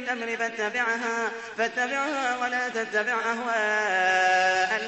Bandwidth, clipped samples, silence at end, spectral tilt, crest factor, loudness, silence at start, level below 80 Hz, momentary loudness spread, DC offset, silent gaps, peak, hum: 8.4 kHz; under 0.1%; 0 s; -2 dB/octave; 16 dB; -25 LUFS; 0 s; -70 dBFS; 7 LU; under 0.1%; none; -10 dBFS; none